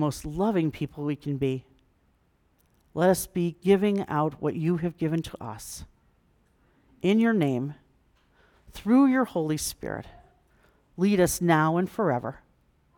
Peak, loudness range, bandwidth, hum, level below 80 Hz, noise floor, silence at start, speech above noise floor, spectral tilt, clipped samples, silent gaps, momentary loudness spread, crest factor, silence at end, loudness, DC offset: -8 dBFS; 4 LU; 19.5 kHz; none; -54 dBFS; -67 dBFS; 0 s; 41 dB; -6 dB/octave; under 0.1%; none; 15 LU; 18 dB; 0.6 s; -26 LUFS; under 0.1%